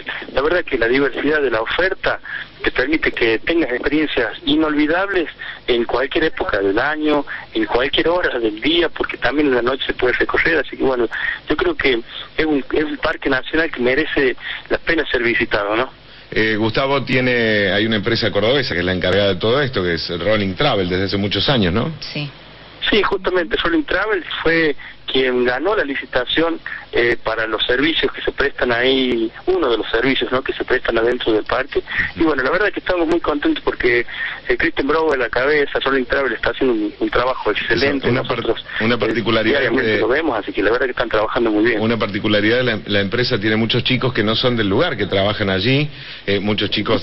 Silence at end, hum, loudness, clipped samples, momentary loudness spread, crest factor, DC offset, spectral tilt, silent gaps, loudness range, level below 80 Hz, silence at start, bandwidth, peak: 0 s; none; -18 LUFS; under 0.1%; 5 LU; 14 dB; under 0.1%; -7 dB/octave; none; 2 LU; -38 dBFS; 0 s; 6.4 kHz; -4 dBFS